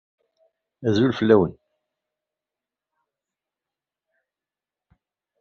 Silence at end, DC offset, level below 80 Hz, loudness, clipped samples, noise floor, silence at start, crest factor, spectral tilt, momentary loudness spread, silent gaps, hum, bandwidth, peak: 3.9 s; under 0.1%; -62 dBFS; -20 LUFS; under 0.1%; -90 dBFS; 0.8 s; 24 dB; -6 dB/octave; 10 LU; none; 50 Hz at -65 dBFS; 7 kHz; -4 dBFS